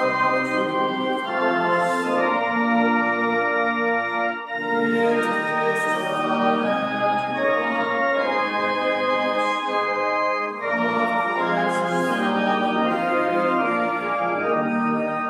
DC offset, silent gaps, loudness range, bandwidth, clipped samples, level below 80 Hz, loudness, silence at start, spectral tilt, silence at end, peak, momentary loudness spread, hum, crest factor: under 0.1%; none; 1 LU; 13.5 kHz; under 0.1%; -74 dBFS; -22 LUFS; 0 s; -5.5 dB/octave; 0 s; -8 dBFS; 3 LU; none; 12 dB